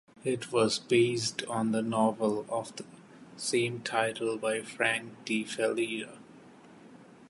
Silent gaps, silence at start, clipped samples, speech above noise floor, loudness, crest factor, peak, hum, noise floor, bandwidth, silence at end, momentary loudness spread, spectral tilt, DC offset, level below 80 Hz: none; 0.25 s; under 0.1%; 23 dB; -30 LUFS; 22 dB; -10 dBFS; none; -53 dBFS; 11.5 kHz; 0.05 s; 10 LU; -4 dB/octave; under 0.1%; -74 dBFS